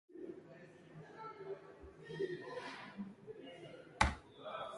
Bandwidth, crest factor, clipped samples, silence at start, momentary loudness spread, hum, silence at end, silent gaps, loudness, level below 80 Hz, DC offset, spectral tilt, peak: 11.5 kHz; 32 dB; under 0.1%; 0.1 s; 21 LU; none; 0 s; none; -44 LUFS; -54 dBFS; under 0.1%; -4.5 dB/octave; -14 dBFS